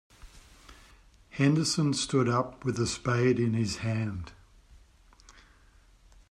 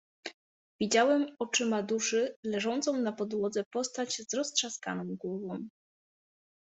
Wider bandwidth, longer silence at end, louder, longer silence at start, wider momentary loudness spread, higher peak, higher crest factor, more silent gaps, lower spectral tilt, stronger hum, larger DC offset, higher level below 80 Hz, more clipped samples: first, 12.5 kHz vs 8.2 kHz; first, 2 s vs 0.9 s; first, -28 LUFS vs -31 LUFS; about the same, 0.25 s vs 0.25 s; about the same, 10 LU vs 12 LU; about the same, -12 dBFS vs -12 dBFS; about the same, 18 dB vs 20 dB; second, none vs 0.34-0.79 s, 2.36-2.43 s, 3.66-3.71 s; first, -5.5 dB/octave vs -3 dB/octave; neither; neither; first, -56 dBFS vs -76 dBFS; neither